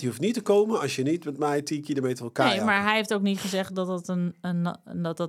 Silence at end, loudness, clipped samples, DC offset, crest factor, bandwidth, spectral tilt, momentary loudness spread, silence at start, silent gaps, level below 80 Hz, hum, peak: 0 s; -26 LUFS; under 0.1%; under 0.1%; 20 dB; 15.5 kHz; -5 dB/octave; 7 LU; 0 s; none; -78 dBFS; none; -6 dBFS